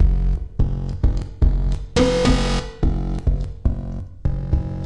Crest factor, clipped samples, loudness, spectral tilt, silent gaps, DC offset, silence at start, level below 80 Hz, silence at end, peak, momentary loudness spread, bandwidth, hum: 14 dB; under 0.1%; -22 LUFS; -6.5 dB/octave; none; 0.7%; 0 s; -22 dBFS; 0 s; -4 dBFS; 8 LU; 10.5 kHz; none